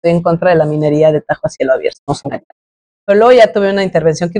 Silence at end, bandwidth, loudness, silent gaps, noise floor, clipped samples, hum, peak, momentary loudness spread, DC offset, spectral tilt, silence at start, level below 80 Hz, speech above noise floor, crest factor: 0 s; 10 kHz; -12 LUFS; 1.99-2.07 s, 2.44-3.07 s; under -90 dBFS; under 0.1%; none; 0 dBFS; 13 LU; under 0.1%; -6.5 dB/octave; 0.05 s; -46 dBFS; over 79 dB; 12 dB